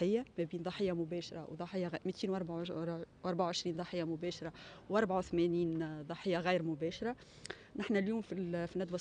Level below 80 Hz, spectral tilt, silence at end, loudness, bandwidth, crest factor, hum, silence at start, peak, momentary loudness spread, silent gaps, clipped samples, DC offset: -66 dBFS; -6 dB/octave; 0 s; -38 LUFS; 9.8 kHz; 18 dB; none; 0 s; -20 dBFS; 10 LU; none; under 0.1%; under 0.1%